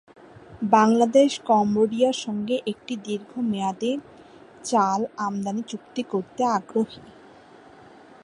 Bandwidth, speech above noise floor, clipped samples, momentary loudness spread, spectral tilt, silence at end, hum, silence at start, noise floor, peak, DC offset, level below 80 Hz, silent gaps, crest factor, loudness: 11.5 kHz; 26 dB; under 0.1%; 14 LU; -5 dB/octave; 1.15 s; none; 0.5 s; -49 dBFS; -4 dBFS; under 0.1%; -66 dBFS; none; 20 dB; -24 LUFS